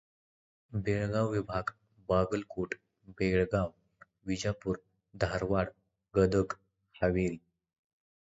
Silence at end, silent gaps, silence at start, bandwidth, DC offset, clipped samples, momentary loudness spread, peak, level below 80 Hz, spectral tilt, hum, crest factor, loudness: 0.9 s; none; 0.7 s; 8 kHz; under 0.1%; under 0.1%; 12 LU; -14 dBFS; -50 dBFS; -7 dB/octave; none; 20 dB; -33 LUFS